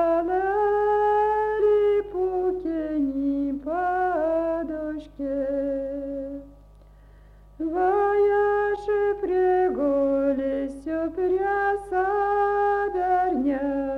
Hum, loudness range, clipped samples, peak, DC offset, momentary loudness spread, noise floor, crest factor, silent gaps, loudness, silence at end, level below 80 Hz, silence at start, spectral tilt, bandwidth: 50 Hz at -50 dBFS; 5 LU; under 0.1%; -12 dBFS; under 0.1%; 9 LU; -50 dBFS; 12 dB; none; -24 LUFS; 0 s; -50 dBFS; 0 s; -7.5 dB/octave; 5.6 kHz